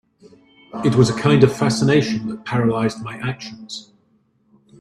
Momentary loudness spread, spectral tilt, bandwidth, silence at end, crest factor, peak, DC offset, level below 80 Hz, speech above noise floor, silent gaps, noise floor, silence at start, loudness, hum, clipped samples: 18 LU; -6.5 dB/octave; 12.5 kHz; 1 s; 20 dB; 0 dBFS; under 0.1%; -52 dBFS; 43 dB; none; -61 dBFS; 0.75 s; -18 LUFS; none; under 0.1%